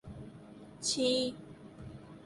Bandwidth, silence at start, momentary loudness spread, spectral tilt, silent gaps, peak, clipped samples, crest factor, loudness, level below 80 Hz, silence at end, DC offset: 11.5 kHz; 0.05 s; 22 LU; -3 dB/octave; none; -18 dBFS; under 0.1%; 20 dB; -32 LUFS; -62 dBFS; 0 s; under 0.1%